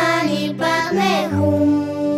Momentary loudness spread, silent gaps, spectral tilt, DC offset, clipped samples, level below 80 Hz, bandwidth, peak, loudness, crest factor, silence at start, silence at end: 3 LU; none; -5.5 dB/octave; under 0.1%; under 0.1%; -58 dBFS; 15.5 kHz; -4 dBFS; -18 LUFS; 14 dB; 0 s; 0 s